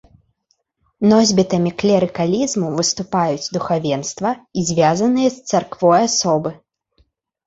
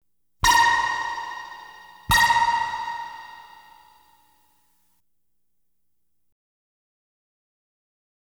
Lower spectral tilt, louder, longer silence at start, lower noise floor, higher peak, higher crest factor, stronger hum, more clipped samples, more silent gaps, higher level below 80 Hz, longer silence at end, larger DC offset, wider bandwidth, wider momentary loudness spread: first, -4.5 dB/octave vs -1 dB/octave; first, -17 LUFS vs -20 LUFS; first, 1 s vs 0.45 s; second, -67 dBFS vs -79 dBFS; first, -2 dBFS vs -8 dBFS; about the same, 16 dB vs 20 dB; neither; neither; neither; second, -54 dBFS vs -46 dBFS; second, 0.9 s vs 4.9 s; neither; second, 8 kHz vs over 20 kHz; second, 8 LU vs 24 LU